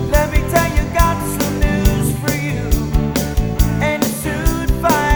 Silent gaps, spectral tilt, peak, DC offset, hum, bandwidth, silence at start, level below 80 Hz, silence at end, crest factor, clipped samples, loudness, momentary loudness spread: none; -5.5 dB/octave; 0 dBFS; under 0.1%; none; over 20 kHz; 0 s; -20 dBFS; 0 s; 16 dB; under 0.1%; -17 LUFS; 3 LU